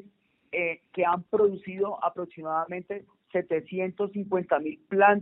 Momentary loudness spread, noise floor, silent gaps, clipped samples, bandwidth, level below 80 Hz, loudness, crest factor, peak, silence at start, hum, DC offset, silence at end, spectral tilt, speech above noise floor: 9 LU; -61 dBFS; none; under 0.1%; 3.9 kHz; -72 dBFS; -28 LUFS; 22 dB; -6 dBFS; 0.5 s; none; under 0.1%; 0 s; -5 dB/octave; 33 dB